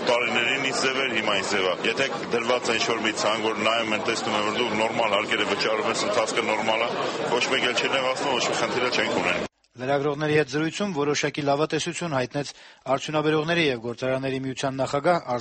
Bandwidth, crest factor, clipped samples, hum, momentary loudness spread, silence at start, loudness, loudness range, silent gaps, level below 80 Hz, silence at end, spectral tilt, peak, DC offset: 8.8 kHz; 16 dB; under 0.1%; none; 5 LU; 0 s; -24 LUFS; 2 LU; none; -62 dBFS; 0 s; -3.5 dB/octave; -8 dBFS; under 0.1%